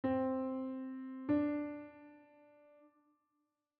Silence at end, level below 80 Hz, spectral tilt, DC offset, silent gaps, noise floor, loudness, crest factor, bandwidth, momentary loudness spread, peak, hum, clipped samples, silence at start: 1.55 s; -76 dBFS; -7 dB/octave; under 0.1%; none; -85 dBFS; -39 LUFS; 18 dB; 4.5 kHz; 20 LU; -22 dBFS; none; under 0.1%; 0.05 s